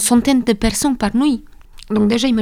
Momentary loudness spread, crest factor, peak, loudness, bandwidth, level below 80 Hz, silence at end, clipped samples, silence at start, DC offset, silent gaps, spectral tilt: 6 LU; 16 dB; 0 dBFS; -16 LUFS; 16 kHz; -34 dBFS; 0 s; under 0.1%; 0 s; under 0.1%; none; -4 dB/octave